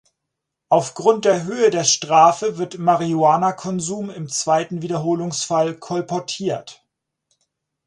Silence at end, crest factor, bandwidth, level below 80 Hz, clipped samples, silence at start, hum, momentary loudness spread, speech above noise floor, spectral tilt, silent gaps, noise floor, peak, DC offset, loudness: 1.15 s; 20 dB; 11.5 kHz; -66 dBFS; under 0.1%; 0.7 s; none; 10 LU; 62 dB; -4 dB/octave; none; -80 dBFS; 0 dBFS; under 0.1%; -19 LUFS